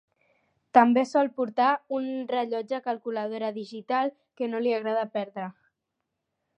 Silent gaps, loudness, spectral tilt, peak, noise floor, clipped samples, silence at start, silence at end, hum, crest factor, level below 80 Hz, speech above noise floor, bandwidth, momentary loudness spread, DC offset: none; -27 LUFS; -5.5 dB/octave; -4 dBFS; -83 dBFS; under 0.1%; 0.75 s; 1.05 s; none; 24 dB; -84 dBFS; 56 dB; 8.8 kHz; 12 LU; under 0.1%